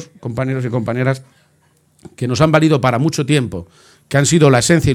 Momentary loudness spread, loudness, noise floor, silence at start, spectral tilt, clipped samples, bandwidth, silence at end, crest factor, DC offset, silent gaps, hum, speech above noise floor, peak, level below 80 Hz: 14 LU; -15 LUFS; -57 dBFS; 0 s; -5.5 dB/octave; under 0.1%; 15 kHz; 0 s; 16 dB; under 0.1%; none; none; 41 dB; 0 dBFS; -42 dBFS